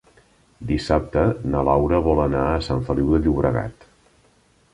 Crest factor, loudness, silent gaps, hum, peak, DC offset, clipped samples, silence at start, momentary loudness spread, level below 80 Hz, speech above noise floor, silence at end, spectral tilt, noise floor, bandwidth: 18 dB; -21 LUFS; none; none; -2 dBFS; under 0.1%; under 0.1%; 0.6 s; 8 LU; -32 dBFS; 38 dB; 1 s; -8 dB/octave; -58 dBFS; 11 kHz